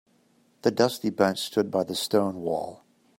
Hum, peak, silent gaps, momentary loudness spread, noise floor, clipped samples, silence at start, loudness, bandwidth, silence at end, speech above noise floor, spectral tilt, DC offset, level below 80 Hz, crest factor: none; -6 dBFS; none; 7 LU; -64 dBFS; under 0.1%; 0.65 s; -26 LUFS; 16.5 kHz; 0.45 s; 39 dB; -4.5 dB/octave; under 0.1%; -68 dBFS; 20 dB